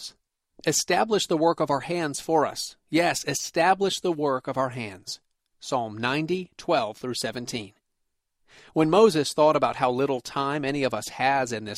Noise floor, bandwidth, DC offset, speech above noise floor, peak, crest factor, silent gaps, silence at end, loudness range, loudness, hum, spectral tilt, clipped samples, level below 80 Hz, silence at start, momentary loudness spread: -77 dBFS; 15.5 kHz; under 0.1%; 52 dB; -6 dBFS; 18 dB; none; 0 s; 6 LU; -25 LUFS; none; -4 dB/octave; under 0.1%; -64 dBFS; 0 s; 12 LU